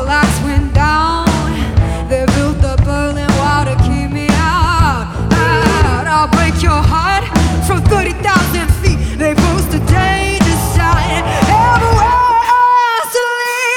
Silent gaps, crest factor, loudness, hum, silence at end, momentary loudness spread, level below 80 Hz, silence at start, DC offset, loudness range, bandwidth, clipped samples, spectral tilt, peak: none; 12 dB; -12 LUFS; none; 0 s; 5 LU; -20 dBFS; 0 s; under 0.1%; 2 LU; 17.5 kHz; under 0.1%; -5.5 dB/octave; 0 dBFS